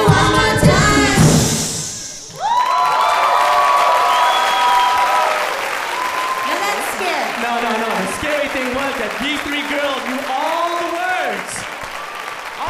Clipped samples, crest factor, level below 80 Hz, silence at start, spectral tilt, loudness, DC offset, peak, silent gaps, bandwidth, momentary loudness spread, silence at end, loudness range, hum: under 0.1%; 16 dB; -36 dBFS; 0 s; -4 dB/octave; -16 LUFS; under 0.1%; 0 dBFS; none; 15.5 kHz; 12 LU; 0 s; 6 LU; none